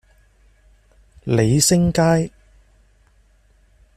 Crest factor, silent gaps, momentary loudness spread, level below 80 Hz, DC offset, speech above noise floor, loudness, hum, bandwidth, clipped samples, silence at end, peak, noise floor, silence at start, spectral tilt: 20 dB; none; 13 LU; -44 dBFS; under 0.1%; 39 dB; -17 LUFS; none; 14.5 kHz; under 0.1%; 1.7 s; -2 dBFS; -56 dBFS; 1.25 s; -5 dB/octave